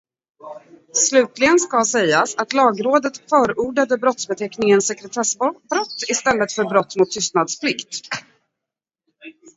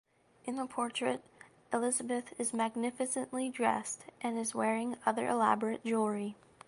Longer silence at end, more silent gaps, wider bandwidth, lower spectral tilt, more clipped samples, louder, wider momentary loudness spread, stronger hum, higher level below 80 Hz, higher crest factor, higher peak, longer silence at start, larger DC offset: about the same, 0.25 s vs 0.35 s; neither; second, 8 kHz vs 11.5 kHz; about the same, -2.5 dB/octave vs -3.5 dB/octave; neither; first, -18 LUFS vs -34 LUFS; about the same, 10 LU vs 9 LU; neither; first, -60 dBFS vs -78 dBFS; about the same, 20 dB vs 22 dB; first, 0 dBFS vs -14 dBFS; about the same, 0.45 s vs 0.45 s; neither